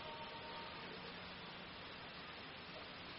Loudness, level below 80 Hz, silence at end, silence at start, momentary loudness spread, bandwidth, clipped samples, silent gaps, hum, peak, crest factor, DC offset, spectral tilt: -50 LUFS; -72 dBFS; 0 s; 0 s; 2 LU; 5.8 kHz; under 0.1%; none; none; -38 dBFS; 14 dB; under 0.1%; -1.5 dB/octave